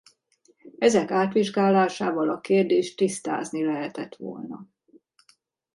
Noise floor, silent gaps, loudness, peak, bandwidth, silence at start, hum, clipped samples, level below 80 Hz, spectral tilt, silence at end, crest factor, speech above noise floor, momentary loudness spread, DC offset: -64 dBFS; none; -24 LUFS; -6 dBFS; 11.5 kHz; 0.65 s; none; under 0.1%; -72 dBFS; -5.5 dB/octave; 1.1 s; 20 dB; 40 dB; 15 LU; under 0.1%